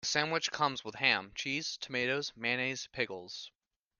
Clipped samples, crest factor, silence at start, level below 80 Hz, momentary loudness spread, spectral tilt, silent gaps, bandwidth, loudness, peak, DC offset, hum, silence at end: under 0.1%; 24 dB; 0 s; -72 dBFS; 11 LU; -2.5 dB/octave; none; 11 kHz; -33 LUFS; -12 dBFS; under 0.1%; none; 0.5 s